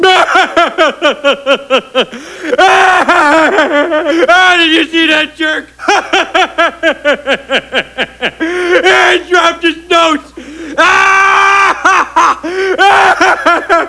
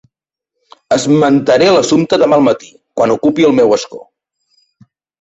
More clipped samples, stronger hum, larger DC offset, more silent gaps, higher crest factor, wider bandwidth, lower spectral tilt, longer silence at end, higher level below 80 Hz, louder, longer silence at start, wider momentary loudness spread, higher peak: first, 1% vs under 0.1%; neither; neither; neither; about the same, 10 dB vs 12 dB; first, 11 kHz vs 8.2 kHz; second, -2 dB/octave vs -5 dB/octave; second, 0 s vs 1.25 s; first, -44 dBFS vs -52 dBFS; first, -8 LUFS vs -11 LUFS; second, 0 s vs 0.9 s; about the same, 9 LU vs 7 LU; about the same, 0 dBFS vs 0 dBFS